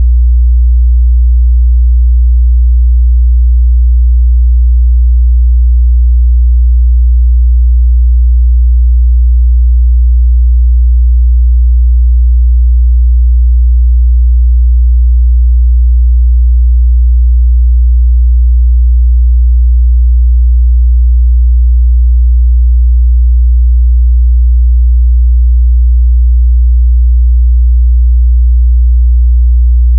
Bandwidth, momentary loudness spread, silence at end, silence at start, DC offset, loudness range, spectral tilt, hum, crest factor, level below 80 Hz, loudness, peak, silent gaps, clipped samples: 0.1 kHz; 0 LU; 0 s; 0 s; under 0.1%; 0 LU; -17.5 dB/octave; none; 4 dB; -4 dBFS; -9 LUFS; -2 dBFS; none; under 0.1%